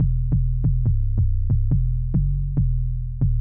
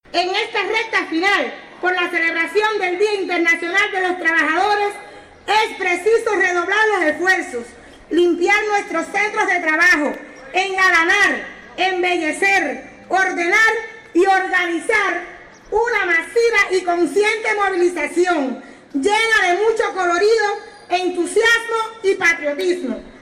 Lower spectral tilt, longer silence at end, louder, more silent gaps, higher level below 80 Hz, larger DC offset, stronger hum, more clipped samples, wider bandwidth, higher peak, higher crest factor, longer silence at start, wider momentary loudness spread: first, -16 dB/octave vs -2 dB/octave; about the same, 0 s vs 0.05 s; second, -23 LUFS vs -17 LUFS; neither; first, -22 dBFS vs -54 dBFS; first, 0.3% vs under 0.1%; neither; neither; second, 1.2 kHz vs 14.5 kHz; second, -10 dBFS vs -6 dBFS; about the same, 10 dB vs 12 dB; second, 0 s vs 0.15 s; second, 2 LU vs 9 LU